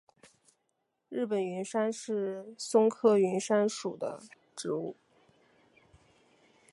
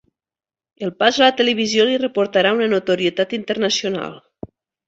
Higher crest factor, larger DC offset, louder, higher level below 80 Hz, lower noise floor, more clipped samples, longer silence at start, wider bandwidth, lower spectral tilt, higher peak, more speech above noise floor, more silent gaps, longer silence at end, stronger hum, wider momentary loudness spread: about the same, 20 dB vs 18 dB; neither; second, -31 LUFS vs -18 LUFS; second, -80 dBFS vs -60 dBFS; second, -80 dBFS vs under -90 dBFS; neither; first, 1.1 s vs 0.8 s; first, 11.5 kHz vs 8 kHz; first, -5 dB/octave vs -3.5 dB/octave; second, -12 dBFS vs -2 dBFS; second, 50 dB vs over 72 dB; neither; first, 1.8 s vs 0.7 s; neither; about the same, 15 LU vs 13 LU